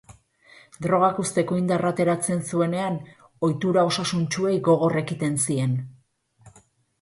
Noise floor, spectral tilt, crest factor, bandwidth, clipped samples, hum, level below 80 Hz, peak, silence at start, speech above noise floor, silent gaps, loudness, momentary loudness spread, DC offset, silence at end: -61 dBFS; -5.5 dB/octave; 18 dB; 11.5 kHz; under 0.1%; none; -62 dBFS; -6 dBFS; 0.1 s; 38 dB; none; -23 LUFS; 7 LU; under 0.1%; 0.5 s